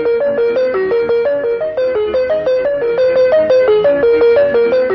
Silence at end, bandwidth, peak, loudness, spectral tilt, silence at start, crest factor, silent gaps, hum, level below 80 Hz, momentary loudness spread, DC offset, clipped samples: 0 s; 6 kHz; -2 dBFS; -13 LUFS; -6.5 dB/octave; 0 s; 10 dB; none; none; -48 dBFS; 5 LU; under 0.1%; under 0.1%